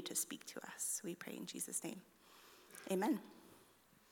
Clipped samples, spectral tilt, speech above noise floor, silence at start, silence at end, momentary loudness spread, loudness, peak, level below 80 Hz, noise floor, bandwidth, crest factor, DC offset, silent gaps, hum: under 0.1%; -3 dB/octave; 25 dB; 0 s; 0.4 s; 22 LU; -43 LUFS; -26 dBFS; -88 dBFS; -69 dBFS; 19 kHz; 20 dB; under 0.1%; none; none